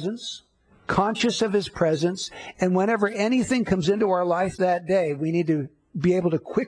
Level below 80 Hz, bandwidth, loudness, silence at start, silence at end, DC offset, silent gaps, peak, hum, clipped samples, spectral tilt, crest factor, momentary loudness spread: -54 dBFS; 10.5 kHz; -23 LUFS; 0 s; 0 s; under 0.1%; none; -8 dBFS; none; under 0.1%; -5.5 dB/octave; 16 dB; 10 LU